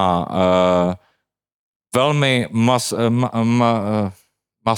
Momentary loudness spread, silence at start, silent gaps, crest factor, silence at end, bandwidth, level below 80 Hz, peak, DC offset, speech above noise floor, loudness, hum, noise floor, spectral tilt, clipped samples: 8 LU; 0 s; 1.54-1.80 s; 16 dB; 0 s; 17.5 kHz; -58 dBFS; -4 dBFS; under 0.1%; 56 dB; -18 LUFS; none; -73 dBFS; -5.5 dB/octave; under 0.1%